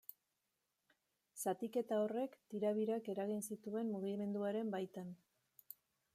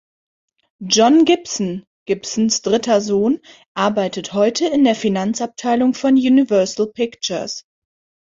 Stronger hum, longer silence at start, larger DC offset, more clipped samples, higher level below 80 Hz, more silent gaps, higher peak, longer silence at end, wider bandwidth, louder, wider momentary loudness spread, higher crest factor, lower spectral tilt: neither; first, 1.35 s vs 0.8 s; neither; neither; second, under -90 dBFS vs -60 dBFS; second, none vs 1.87-2.06 s, 3.67-3.75 s; second, -26 dBFS vs -2 dBFS; first, 1 s vs 0.65 s; first, 15 kHz vs 7.8 kHz; second, -42 LUFS vs -17 LUFS; first, 19 LU vs 12 LU; about the same, 16 dB vs 16 dB; first, -6 dB/octave vs -4 dB/octave